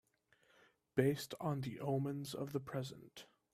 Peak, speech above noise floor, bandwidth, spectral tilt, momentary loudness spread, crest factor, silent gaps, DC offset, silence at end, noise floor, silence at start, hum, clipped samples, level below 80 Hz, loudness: -18 dBFS; 35 dB; 15.5 kHz; -6.5 dB/octave; 16 LU; 24 dB; none; under 0.1%; 0.3 s; -75 dBFS; 0.95 s; none; under 0.1%; -74 dBFS; -41 LUFS